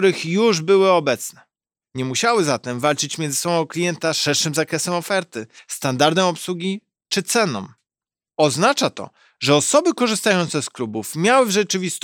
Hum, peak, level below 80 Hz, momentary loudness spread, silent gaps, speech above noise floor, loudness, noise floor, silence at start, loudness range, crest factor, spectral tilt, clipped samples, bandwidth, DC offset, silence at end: none; -2 dBFS; -70 dBFS; 13 LU; none; over 71 dB; -19 LUFS; under -90 dBFS; 0 s; 3 LU; 18 dB; -3.5 dB/octave; under 0.1%; 18 kHz; under 0.1%; 0.05 s